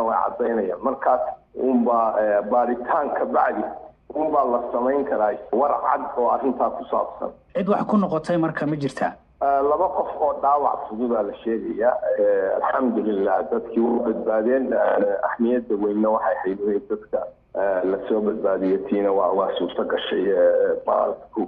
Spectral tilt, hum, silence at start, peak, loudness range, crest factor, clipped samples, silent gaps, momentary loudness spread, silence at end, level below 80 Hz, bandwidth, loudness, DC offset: -8 dB/octave; none; 0 s; -6 dBFS; 2 LU; 14 dB; under 0.1%; none; 6 LU; 0 s; -58 dBFS; 9.2 kHz; -22 LUFS; under 0.1%